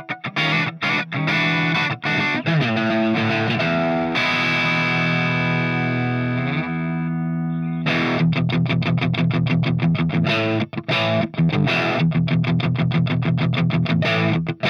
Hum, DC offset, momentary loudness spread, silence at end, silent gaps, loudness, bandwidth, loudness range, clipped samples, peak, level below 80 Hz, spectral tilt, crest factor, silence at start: none; under 0.1%; 4 LU; 0 s; none; -20 LUFS; 6.8 kHz; 2 LU; under 0.1%; -8 dBFS; -54 dBFS; -7 dB/octave; 12 dB; 0 s